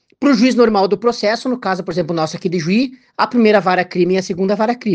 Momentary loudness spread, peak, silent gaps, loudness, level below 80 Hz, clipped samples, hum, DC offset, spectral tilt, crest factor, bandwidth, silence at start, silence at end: 8 LU; 0 dBFS; none; -16 LUFS; -56 dBFS; under 0.1%; none; under 0.1%; -6 dB/octave; 16 dB; 9 kHz; 0.2 s; 0 s